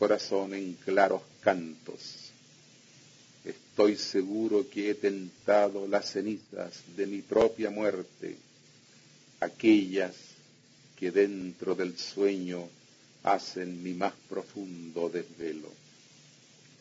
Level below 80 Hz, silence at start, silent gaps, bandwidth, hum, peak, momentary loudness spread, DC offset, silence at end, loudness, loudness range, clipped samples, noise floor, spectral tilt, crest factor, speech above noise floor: -72 dBFS; 0 s; none; 7.8 kHz; none; -8 dBFS; 17 LU; under 0.1%; 1.05 s; -30 LUFS; 6 LU; under 0.1%; -59 dBFS; -5 dB/octave; 22 dB; 29 dB